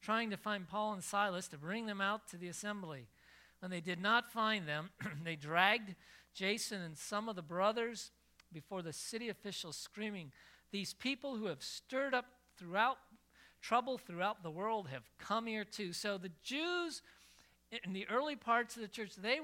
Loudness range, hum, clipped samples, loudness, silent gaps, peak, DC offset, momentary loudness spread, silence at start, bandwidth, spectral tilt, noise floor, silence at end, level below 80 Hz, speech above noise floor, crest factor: 5 LU; none; under 0.1%; -39 LUFS; none; -16 dBFS; under 0.1%; 13 LU; 0 s; 16.5 kHz; -3.5 dB/octave; -67 dBFS; 0 s; -78 dBFS; 27 dB; 26 dB